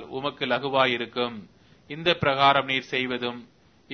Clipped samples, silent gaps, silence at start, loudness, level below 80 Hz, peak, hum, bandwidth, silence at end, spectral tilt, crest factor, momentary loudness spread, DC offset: under 0.1%; none; 0 s; -24 LUFS; -62 dBFS; -4 dBFS; none; 6.6 kHz; 0 s; -5.5 dB/octave; 22 dB; 13 LU; under 0.1%